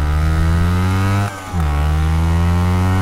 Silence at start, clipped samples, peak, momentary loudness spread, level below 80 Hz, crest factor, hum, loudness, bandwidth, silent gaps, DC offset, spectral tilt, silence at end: 0 s; under 0.1%; -6 dBFS; 4 LU; -20 dBFS; 10 dB; none; -17 LUFS; 14 kHz; none; under 0.1%; -7 dB/octave; 0 s